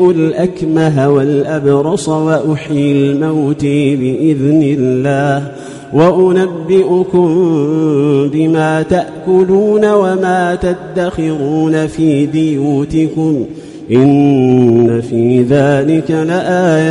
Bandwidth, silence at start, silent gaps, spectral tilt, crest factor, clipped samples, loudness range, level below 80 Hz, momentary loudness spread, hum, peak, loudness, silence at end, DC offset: 11 kHz; 0 s; none; -7.5 dB/octave; 10 dB; under 0.1%; 2 LU; -42 dBFS; 6 LU; none; 0 dBFS; -12 LUFS; 0 s; under 0.1%